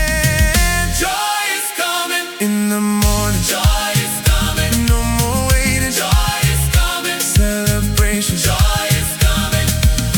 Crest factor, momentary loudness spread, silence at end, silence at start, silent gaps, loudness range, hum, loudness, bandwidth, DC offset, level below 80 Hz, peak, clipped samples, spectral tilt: 14 dB; 3 LU; 0 s; 0 s; none; 1 LU; none; -15 LUFS; 19.5 kHz; under 0.1%; -20 dBFS; 0 dBFS; under 0.1%; -3.5 dB/octave